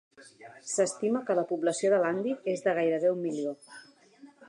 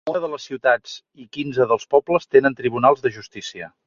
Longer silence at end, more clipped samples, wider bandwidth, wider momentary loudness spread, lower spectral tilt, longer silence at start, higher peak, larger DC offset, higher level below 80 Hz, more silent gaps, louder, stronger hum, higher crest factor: about the same, 0.2 s vs 0.2 s; neither; first, 11 kHz vs 7.4 kHz; second, 10 LU vs 16 LU; about the same, -4.5 dB/octave vs -5.5 dB/octave; first, 0.2 s vs 0.05 s; second, -14 dBFS vs -2 dBFS; neither; second, -86 dBFS vs -62 dBFS; neither; second, -29 LUFS vs -20 LUFS; neither; about the same, 16 dB vs 18 dB